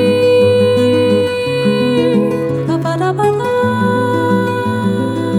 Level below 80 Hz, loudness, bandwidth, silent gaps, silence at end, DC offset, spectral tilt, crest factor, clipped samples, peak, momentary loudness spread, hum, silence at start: -52 dBFS; -13 LUFS; 14 kHz; none; 0 s; under 0.1%; -7 dB/octave; 12 dB; under 0.1%; -2 dBFS; 6 LU; none; 0 s